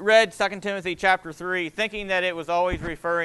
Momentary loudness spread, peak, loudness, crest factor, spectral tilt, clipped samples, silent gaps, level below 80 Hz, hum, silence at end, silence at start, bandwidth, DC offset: 8 LU; -6 dBFS; -24 LUFS; 18 dB; -4 dB/octave; under 0.1%; none; -46 dBFS; none; 0 s; 0 s; 12.5 kHz; under 0.1%